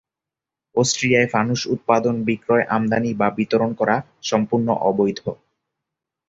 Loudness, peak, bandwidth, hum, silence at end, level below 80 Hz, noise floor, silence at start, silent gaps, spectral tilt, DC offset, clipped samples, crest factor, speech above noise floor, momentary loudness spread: -20 LUFS; -2 dBFS; 8 kHz; none; 0.95 s; -58 dBFS; -87 dBFS; 0.75 s; none; -5 dB/octave; under 0.1%; under 0.1%; 18 dB; 68 dB; 6 LU